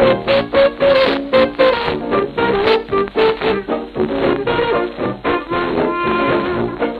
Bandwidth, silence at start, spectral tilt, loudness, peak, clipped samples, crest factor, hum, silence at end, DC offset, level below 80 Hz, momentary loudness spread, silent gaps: 5.6 kHz; 0 s; -7 dB/octave; -16 LUFS; 0 dBFS; under 0.1%; 14 dB; none; 0 s; under 0.1%; -40 dBFS; 7 LU; none